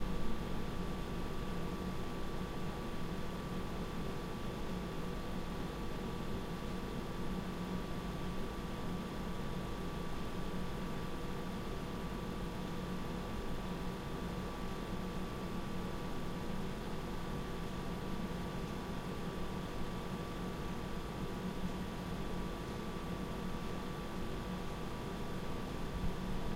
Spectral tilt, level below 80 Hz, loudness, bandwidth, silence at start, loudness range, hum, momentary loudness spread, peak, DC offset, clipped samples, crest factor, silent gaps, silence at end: -6 dB/octave; -46 dBFS; -42 LUFS; 16 kHz; 0 s; 0 LU; none; 1 LU; -24 dBFS; under 0.1%; under 0.1%; 16 dB; none; 0 s